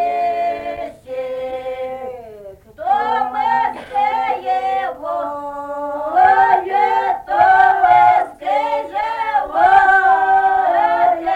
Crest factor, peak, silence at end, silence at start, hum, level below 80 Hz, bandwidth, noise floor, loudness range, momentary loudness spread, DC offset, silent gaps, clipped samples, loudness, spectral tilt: 14 dB; -2 dBFS; 0 s; 0 s; none; -52 dBFS; 8.4 kHz; -37 dBFS; 8 LU; 15 LU; under 0.1%; none; under 0.1%; -16 LUFS; -4.5 dB/octave